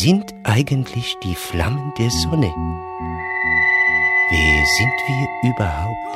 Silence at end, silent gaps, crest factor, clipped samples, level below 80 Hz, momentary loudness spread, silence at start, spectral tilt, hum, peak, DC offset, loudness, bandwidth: 0 s; none; 16 dB; under 0.1%; -32 dBFS; 11 LU; 0 s; -4.5 dB/octave; none; -2 dBFS; under 0.1%; -17 LUFS; 16 kHz